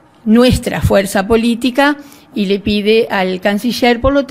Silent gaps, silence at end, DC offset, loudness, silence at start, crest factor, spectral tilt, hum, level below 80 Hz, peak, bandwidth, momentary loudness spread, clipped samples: none; 0 s; under 0.1%; -13 LUFS; 0.25 s; 12 dB; -5.5 dB/octave; none; -30 dBFS; 0 dBFS; 16 kHz; 6 LU; under 0.1%